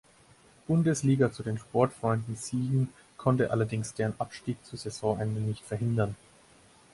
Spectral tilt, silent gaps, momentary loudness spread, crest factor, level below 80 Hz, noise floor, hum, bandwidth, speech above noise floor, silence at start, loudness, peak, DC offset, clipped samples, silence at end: -7 dB/octave; none; 10 LU; 20 dB; -60 dBFS; -59 dBFS; none; 11.5 kHz; 30 dB; 0.7 s; -30 LUFS; -10 dBFS; under 0.1%; under 0.1%; 0.8 s